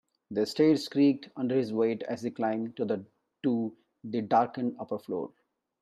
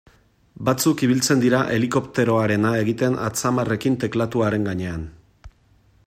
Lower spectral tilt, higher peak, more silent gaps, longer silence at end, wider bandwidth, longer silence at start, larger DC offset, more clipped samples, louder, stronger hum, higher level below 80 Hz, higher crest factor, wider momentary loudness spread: about the same, -6.5 dB/octave vs -5.5 dB/octave; second, -12 dBFS vs -6 dBFS; neither; about the same, 0.55 s vs 0.6 s; second, 13 kHz vs 16 kHz; second, 0.3 s vs 0.6 s; neither; neither; second, -30 LUFS vs -21 LUFS; neither; second, -78 dBFS vs -50 dBFS; about the same, 18 dB vs 16 dB; first, 11 LU vs 8 LU